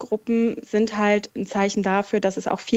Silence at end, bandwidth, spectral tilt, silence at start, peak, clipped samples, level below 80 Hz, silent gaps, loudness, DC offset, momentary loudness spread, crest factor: 0 s; 8.2 kHz; -5.5 dB/octave; 0 s; -8 dBFS; under 0.1%; -60 dBFS; none; -23 LUFS; under 0.1%; 3 LU; 14 dB